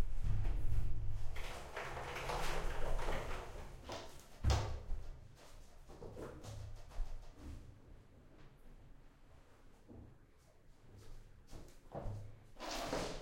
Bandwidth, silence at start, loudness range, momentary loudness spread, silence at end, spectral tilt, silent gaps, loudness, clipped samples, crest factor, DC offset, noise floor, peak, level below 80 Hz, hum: 13 kHz; 0 s; 19 LU; 22 LU; 0 s; -5 dB/octave; none; -45 LUFS; under 0.1%; 18 dB; under 0.1%; -64 dBFS; -22 dBFS; -44 dBFS; none